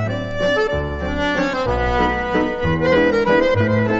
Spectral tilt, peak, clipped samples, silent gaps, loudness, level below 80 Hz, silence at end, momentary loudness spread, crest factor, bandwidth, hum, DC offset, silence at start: -6.5 dB/octave; -4 dBFS; under 0.1%; none; -18 LUFS; -32 dBFS; 0 s; 6 LU; 12 dB; 8 kHz; none; under 0.1%; 0 s